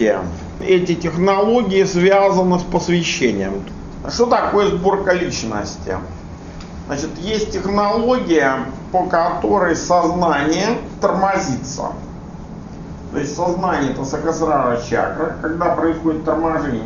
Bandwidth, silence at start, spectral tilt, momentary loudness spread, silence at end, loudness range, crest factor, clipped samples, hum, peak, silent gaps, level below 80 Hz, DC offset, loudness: 7.4 kHz; 0 s; -5.5 dB/octave; 15 LU; 0 s; 5 LU; 18 dB; under 0.1%; none; 0 dBFS; none; -38 dBFS; under 0.1%; -18 LUFS